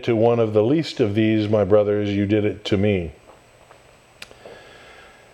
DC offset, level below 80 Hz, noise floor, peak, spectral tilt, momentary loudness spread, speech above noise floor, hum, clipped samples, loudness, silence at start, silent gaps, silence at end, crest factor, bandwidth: under 0.1%; -52 dBFS; -51 dBFS; -4 dBFS; -7.5 dB/octave; 7 LU; 32 dB; none; under 0.1%; -20 LUFS; 0 s; none; 0.75 s; 18 dB; 11 kHz